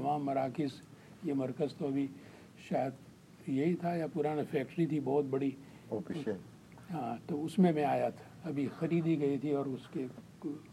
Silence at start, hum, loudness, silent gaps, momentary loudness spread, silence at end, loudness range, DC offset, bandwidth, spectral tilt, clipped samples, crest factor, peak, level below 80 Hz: 0 s; none; -35 LUFS; none; 14 LU; 0 s; 3 LU; under 0.1%; 13.5 kHz; -8 dB/octave; under 0.1%; 18 dB; -16 dBFS; -74 dBFS